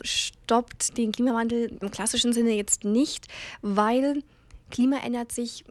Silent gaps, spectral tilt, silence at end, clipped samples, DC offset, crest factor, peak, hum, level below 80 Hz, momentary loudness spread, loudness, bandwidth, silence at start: none; -3 dB/octave; 0.1 s; under 0.1%; under 0.1%; 18 dB; -8 dBFS; none; -54 dBFS; 9 LU; -26 LUFS; 15.5 kHz; 0.05 s